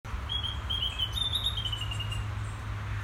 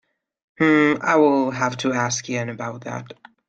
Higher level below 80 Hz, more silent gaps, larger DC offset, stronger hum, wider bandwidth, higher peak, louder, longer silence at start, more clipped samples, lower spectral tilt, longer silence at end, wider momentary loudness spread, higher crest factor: first, -40 dBFS vs -64 dBFS; neither; neither; neither; first, 17 kHz vs 8.8 kHz; second, -18 dBFS vs -6 dBFS; second, -31 LUFS vs -20 LUFS; second, 0.05 s vs 0.6 s; neither; about the same, -3.5 dB/octave vs -4.5 dB/octave; second, 0 s vs 0.35 s; second, 9 LU vs 15 LU; about the same, 16 dB vs 16 dB